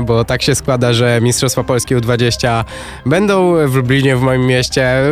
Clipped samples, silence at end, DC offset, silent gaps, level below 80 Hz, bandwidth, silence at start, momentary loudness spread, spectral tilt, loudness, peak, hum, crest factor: under 0.1%; 0 s; under 0.1%; none; -34 dBFS; 15.5 kHz; 0 s; 4 LU; -5 dB/octave; -13 LUFS; 0 dBFS; none; 12 dB